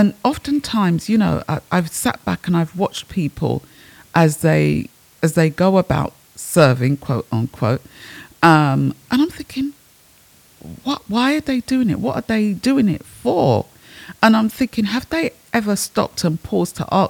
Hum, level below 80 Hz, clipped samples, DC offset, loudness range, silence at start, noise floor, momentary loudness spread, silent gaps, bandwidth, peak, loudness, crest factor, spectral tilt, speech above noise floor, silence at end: none; -48 dBFS; under 0.1%; under 0.1%; 3 LU; 0 s; -51 dBFS; 11 LU; none; 19.5 kHz; 0 dBFS; -18 LUFS; 18 dB; -6 dB/octave; 33 dB; 0 s